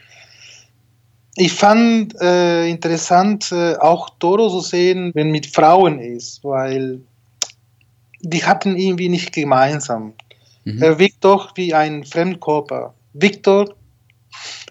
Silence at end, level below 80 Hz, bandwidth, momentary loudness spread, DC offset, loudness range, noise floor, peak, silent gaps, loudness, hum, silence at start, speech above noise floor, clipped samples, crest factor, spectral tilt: 0.1 s; -66 dBFS; 8.4 kHz; 15 LU; under 0.1%; 4 LU; -56 dBFS; 0 dBFS; none; -16 LUFS; none; 1.35 s; 41 dB; under 0.1%; 16 dB; -5 dB/octave